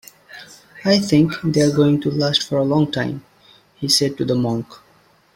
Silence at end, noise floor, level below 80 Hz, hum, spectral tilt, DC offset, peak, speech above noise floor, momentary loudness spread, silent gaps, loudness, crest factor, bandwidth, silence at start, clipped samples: 0.6 s; -55 dBFS; -54 dBFS; none; -5 dB/octave; under 0.1%; -2 dBFS; 37 dB; 22 LU; none; -18 LUFS; 18 dB; 16.5 kHz; 0.3 s; under 0.1%